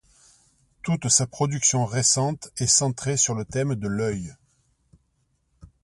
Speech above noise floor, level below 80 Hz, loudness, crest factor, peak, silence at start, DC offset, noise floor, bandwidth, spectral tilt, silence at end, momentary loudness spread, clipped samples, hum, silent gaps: 46 dB; -54 dBFS; -22 LUFS; 22 dB; -4 dBFS; 0.85 s; under 0.1%; -70 dBFS; 11.5 kHz; -3.5 dB/octave; 0.15 s; 9 LU; under 0.1%; none; none